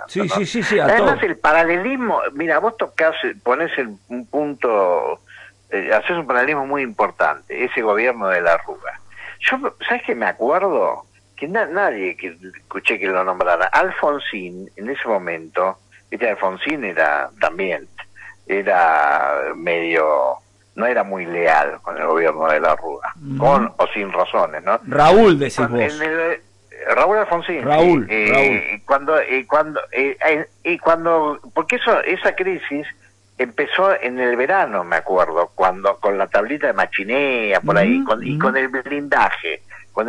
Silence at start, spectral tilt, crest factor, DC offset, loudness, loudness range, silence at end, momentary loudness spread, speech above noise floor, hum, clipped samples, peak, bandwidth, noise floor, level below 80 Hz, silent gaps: 0 s; -5.5 dB/octave; 14 dB; under 0.1%; -18 LUFS; 4 LU; 0 s; 11 LU; 22 dB; none; under 0.1%; -4 dBFS; 11.5 kHz; -40 dBFS; -50 dBFS; none